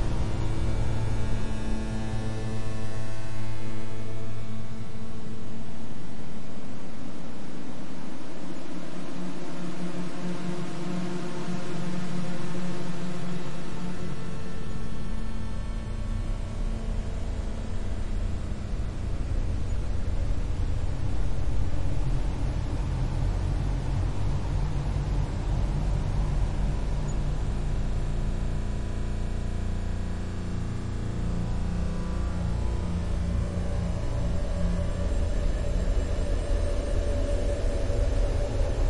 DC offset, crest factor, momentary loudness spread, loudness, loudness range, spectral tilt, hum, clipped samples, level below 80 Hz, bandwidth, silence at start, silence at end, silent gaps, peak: 2%; 12 dB; 9 LU; -32 LUFS; 8 LU; -7 dB/octave; none; under 0.1%; -30 dBFS; 11 kHz; 0 s; 0 s; none; -12 dBFS